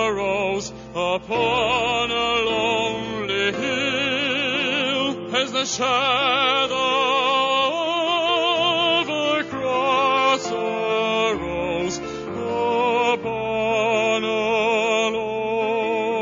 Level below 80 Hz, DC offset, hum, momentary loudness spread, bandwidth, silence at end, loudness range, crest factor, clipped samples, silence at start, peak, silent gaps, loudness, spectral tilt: -52 dBFS; under 0.1%; none; 6 LU; 7.6 kHz; 0 s; 3 LU; 16 dB; under 0.1%; 0 s; -6 dBFS; none; -21 LUFS; -3 dB/octave